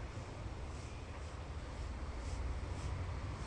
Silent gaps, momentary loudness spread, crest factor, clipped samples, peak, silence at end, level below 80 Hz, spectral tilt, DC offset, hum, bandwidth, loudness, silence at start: none; 5 LU; 12 dB; under 0.1%; -30 dBFS; 0 s; -46 dBFS; -6 dB/octave; under 0.1%; none; 11 kHz; -46 LUFS; 0 s